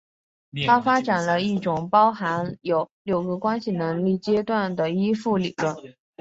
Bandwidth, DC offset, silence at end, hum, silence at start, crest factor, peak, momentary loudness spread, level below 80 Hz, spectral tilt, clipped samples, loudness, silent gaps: 8 kHz; under 0.1%; 0.3 s; none; 0.55 s; 18 dB; -4 dBFS; 8 LU; -62 dBFS; -6.5 dB/octave; under 0.1%; -23 LUFS; 2.91-3.05 s